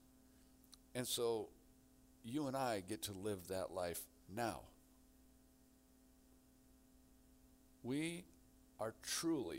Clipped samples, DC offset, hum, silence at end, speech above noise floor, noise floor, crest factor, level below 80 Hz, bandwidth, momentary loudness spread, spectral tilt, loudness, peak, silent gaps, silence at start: under 0.1%; under 0.1%; 60 Hz at -75 dBFS; 0 s; 26 dB; -70 dBFS; 18 dB; -72 dBFS; 16 kHz; 15 LU; -4 dB/octave; -44 LUFS; -28 dBFS; none; 0.15 s